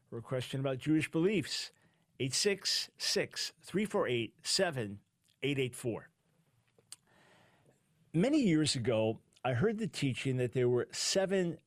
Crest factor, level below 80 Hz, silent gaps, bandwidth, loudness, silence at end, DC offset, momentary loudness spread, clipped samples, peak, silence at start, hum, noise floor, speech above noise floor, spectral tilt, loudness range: 16 dB; -68 dBFS; none; 15.5 kHz; -33 LUFS; 0.1 s; under 0.1%; 9 LU; under 0.1%; -18 dBFS; 0.1 s; none; -73 dBFS; 40 dB; -4.5 dB/octave; 6 LU